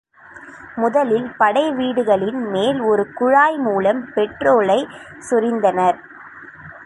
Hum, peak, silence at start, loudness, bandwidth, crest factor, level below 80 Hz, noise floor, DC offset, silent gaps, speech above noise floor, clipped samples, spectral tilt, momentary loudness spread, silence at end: none; -2 dBFS; 0.35 s; -17 LUFS; 11.5 kHz; 16 dB; -58 dBFS; -41 dBFS; under 0.1%; none; 24 dB; under 0.1%; -5.5 dB/octave; 22 LU; 0 s